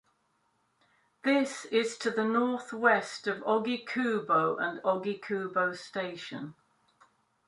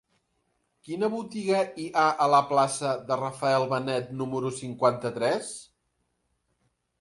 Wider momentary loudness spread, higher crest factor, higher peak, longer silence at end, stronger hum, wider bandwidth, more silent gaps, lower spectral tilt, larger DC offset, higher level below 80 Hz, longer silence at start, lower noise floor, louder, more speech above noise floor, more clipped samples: about the same, 10 LU vs 10 LU; about the same, 22 dB vs 20 dB; about the same, -8 dBFS vs -8 dBFS; second, 0.95 s vs 1.4 s; neither; about the same, 11.5 kHz vs 11.5 kHz; neither; about the same, -4.5 dB/octave vs -5 dB/octave; neither; second, -80 dBFS vs -70 dBFS; first, 1.25 s vs 0.85 s; about the same, -74 dBFS vs -76 dBFS; second, -30 LUFS vs -26 LUFS; second, 44 dB vs 49 dB; neither